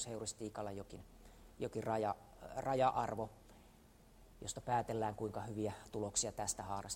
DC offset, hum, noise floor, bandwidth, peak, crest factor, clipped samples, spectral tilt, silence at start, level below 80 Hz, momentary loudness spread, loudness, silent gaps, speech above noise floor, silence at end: under 0.1%; none; -64 dBFS; 16 kHz; -22 dBFS; 20 dB; under 0.1%; -4 dB/octave; 0 s; -64 dBFS; 14 LU; -41 LUFS; none; 23 dB; 0 s